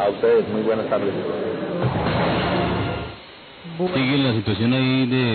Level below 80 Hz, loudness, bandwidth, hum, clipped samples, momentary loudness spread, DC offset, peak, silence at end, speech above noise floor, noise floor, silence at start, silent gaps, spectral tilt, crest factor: -42 dBFS; -21 LUFS; 4.6 kHz; none; under 0.1%; 12 LU; under 0.1%; -8 dBFS; 0 s; 21 dB; -42 dBFS; 0 s; none; -11.5 dB/octave; 12 dB